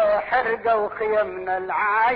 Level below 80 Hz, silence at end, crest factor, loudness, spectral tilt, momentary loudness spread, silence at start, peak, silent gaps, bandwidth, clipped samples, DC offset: -56 dBFS; 0 s; 12 dB; -22 LUFS; -7 dB/octave; 5 LU; 0 s; -10 dBFS; none; 5.2 kHz; under 0.1%; under 0.1%